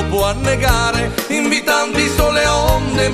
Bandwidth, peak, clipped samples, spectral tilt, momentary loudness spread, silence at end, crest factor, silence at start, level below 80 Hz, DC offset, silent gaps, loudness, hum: 14 kHz; 0 dBFS; under 0.1%; -4 dB/octave; 3 LU; 0 s; 14 dB; 0 s; -24 dBFS; under 0.1%; none; -15 LUFS; none